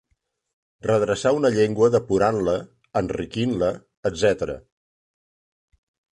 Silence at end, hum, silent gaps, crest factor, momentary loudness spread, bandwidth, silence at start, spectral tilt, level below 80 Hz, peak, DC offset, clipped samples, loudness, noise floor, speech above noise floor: 1.55 s; none; 3.97-4.03 s; 18 dB; 10 LU; 11 kHz; 0.85 s; -6 dB/octave; -50 dBFS; -6 dBFS; under 0.1%; under 0.1%; -22 LUFS; -72 dBFS; 51 dB